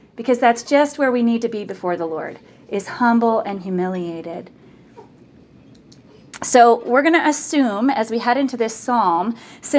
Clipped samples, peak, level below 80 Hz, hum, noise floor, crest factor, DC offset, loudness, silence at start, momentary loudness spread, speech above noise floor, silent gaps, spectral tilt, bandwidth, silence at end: under 0.1%; 0 dBFS; -64 dBFS; none; -47 dBFS; 20 dB; under 0.1%; -18 LUFS; 0.15 s; 14 LU; 29 dB; none; -4.5 dB/octave; 8 kHz; 0 s